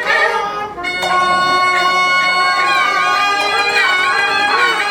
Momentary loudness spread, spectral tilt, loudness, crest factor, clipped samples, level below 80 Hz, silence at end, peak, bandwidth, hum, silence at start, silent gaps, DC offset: 5 LU; -1 dB/octave; -13 LUFS; 14 dB; under 0.1%; -52 dBFS; 0 s; 0 dBFS; 19.5 kHz; none; 0 s; none; under 0.1%